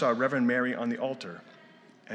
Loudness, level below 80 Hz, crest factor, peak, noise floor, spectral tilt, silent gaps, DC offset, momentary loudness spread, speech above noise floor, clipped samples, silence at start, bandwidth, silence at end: -29 LUFS; -88 dBFS; 16 dB; -14 dBFS; -56 dBFS; -6.5 dB/octave; none; under 0.1%; 16 LU; 27 dB; under 0.1%; 0 s; 8.6 kHz; 0 s